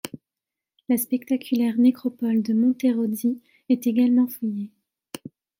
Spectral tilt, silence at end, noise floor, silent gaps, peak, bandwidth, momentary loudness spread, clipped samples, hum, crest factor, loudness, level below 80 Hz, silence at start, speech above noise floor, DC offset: -6 dB/octave; 0.95 s; -88 dBFS; none; -8 dBFS; 17 kHz; 19 LU; under 0.1%; none; 14 dB; -23 LUFS; -74 dBFS; 0.05 s; 66 dB; under 0.1%